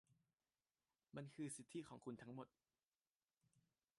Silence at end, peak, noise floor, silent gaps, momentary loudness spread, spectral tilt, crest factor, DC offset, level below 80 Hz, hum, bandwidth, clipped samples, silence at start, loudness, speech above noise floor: 0.4 s; -40 dBFS; under -90 dBFS; 3.24-3.28 s; 7 LU; -5 dB/octave; 18 dB; under 0.1%; -90 dBFS; none; 11 kHz; under 0.1%; 0.1 s; -56 LUFS; over 35 dB